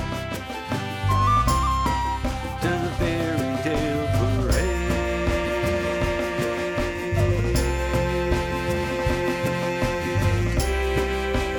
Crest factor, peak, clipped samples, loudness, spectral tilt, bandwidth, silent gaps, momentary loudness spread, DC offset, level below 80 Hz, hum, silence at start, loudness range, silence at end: 16 dB; -8 dBFS; under 0.1%; -24 LUFS; -6 dB/octave; 19.5 kHz; none; 4 LU; under 0.1%; -30 dBFS; none; 0 s; 1 LU; 0 s